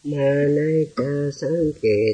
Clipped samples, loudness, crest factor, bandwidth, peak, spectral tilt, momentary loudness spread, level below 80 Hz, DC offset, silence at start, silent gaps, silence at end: under 0.1%; -21 LUFS; 12 dB; 9.4 kHz; -8 dBFS; -7.5 dB/octave; 5 LU; -52 dBFS; under 0.1%; 0.05 s; none; 0 s